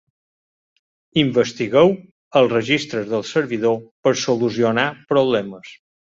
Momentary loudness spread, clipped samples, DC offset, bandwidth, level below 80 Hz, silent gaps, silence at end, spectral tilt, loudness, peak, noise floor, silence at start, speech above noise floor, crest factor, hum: 7 LU; under 0.1%; under 0.1%; 7.8 kHz; -60 dBFS; 2.11-2.31 s, 3.91-4.03 s; 0.3 s; -5 dB/octave; -19 LUFS; -2 dBFS; under -90 dBFS; 1.15 s; over 72 dB; 18 dB; none